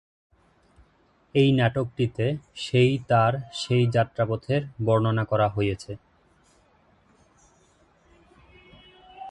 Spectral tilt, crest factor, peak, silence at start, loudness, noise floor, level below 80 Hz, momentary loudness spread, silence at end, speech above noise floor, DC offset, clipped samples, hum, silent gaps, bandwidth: -7 dB/octave; 20 dB; -6 dBFS; 1.35 s; -24 LUFS; -63 dBFS; -54 dBFS; 10 LU; 0 s; 39 dB; under 0.1%; under 0.1%; none; none; 9.8 kHz